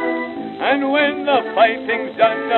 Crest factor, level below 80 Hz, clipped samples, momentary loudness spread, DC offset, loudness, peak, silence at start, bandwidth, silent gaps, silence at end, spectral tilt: 16 dB; -64 dBFS; under 0.1%; 7 LU; under 0.1%; -18 LUFS; -2 dBFS; 0 s; 4.4 kHz; none; 0 s; -7 dB/octave